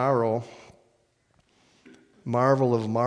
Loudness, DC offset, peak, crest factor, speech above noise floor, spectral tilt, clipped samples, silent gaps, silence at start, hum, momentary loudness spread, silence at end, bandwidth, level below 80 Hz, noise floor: -24 LUFS; under 0.1%; -6 dBFS; 20 dB; 44 dB; -8 dB/octave; under 0.1%; none; 0 s; none; 18 LU; 0 s; 10 kHz; -74 dBFS; -67 dBFS